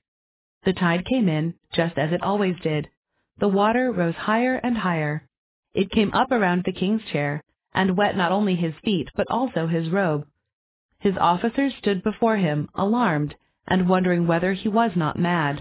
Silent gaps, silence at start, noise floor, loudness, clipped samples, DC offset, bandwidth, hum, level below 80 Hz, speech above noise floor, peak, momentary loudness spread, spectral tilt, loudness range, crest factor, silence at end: 2.97-3.03 s, 5.38-5.63 s, 10.53-10.89 s; 0.65 s; under -90 dBFS; -23 LUFS; under 0.1%; under 0.1%; 4 kHz; none; -52 dBFS; over 68 dB; -8 dBFS; 6 LU; -11 dB/octave; 2 LU; 16 dB; 0 s